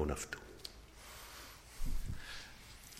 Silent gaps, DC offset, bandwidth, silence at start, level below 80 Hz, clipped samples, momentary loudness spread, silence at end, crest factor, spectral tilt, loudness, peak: none; under 0.1%; 16 kHz; 0 s; -46 dBFS; under 0.1%; 10 LU; 0 s; 18 dB; -4 dB/octave; -48 LUFS; -24 dBFS